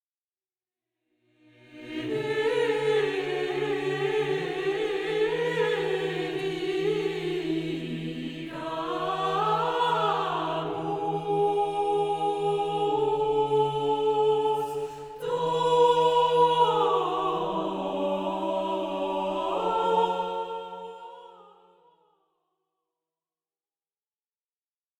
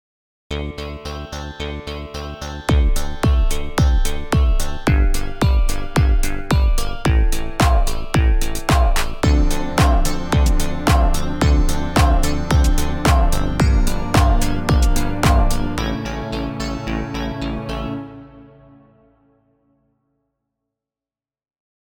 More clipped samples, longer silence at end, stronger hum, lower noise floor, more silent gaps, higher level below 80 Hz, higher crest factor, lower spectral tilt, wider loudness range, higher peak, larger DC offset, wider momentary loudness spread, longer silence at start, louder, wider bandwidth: neither; about the same, 3.55 s vs 3.55 s; neither; about the same, under -90 dBFS vs under -90 dBFS; neither; second, -62 dBFS vs -18 dBFS; about the same, 18 dB vs 14 dB; about the same, -5.5 dB/octave vs -5.5 dB/octave; second, 6 LU vs 9 LU; second, -10 dBFS vs -2 dBFS; neither; about the same, 11 LU vs 11 LU; first, 1.7 s vs 0.5 s; second, -27 LUFS vs -20 LUFS; second, 12.5 kHz vs 17.5 kHz